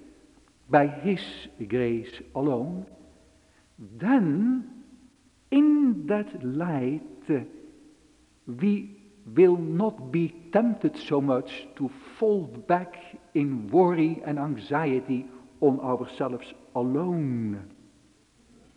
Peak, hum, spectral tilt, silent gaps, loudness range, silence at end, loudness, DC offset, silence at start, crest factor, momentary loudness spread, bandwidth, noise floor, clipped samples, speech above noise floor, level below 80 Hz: -6 dBFS; none; -8.5 dB/octave; none; 4 LU; 1.1 s; -26 LUFS; under 0.1%; 0.7 s; 20 dB; 15 LU; 9.8 kHz; -60 dBFS; under 0.1%; 35 dB; -64 dBFS